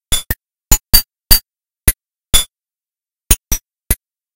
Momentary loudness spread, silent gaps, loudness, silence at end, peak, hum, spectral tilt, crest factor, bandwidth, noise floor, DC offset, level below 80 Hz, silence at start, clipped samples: 12 LU; none; -15 LUFS; 0.4 s; 0 dBFS; none; -1.5 dB/octave; 16 dB; over 20 kHz; under -90 dBFS; 0.5%; -22 dBFS; 0.1 s; 0.5%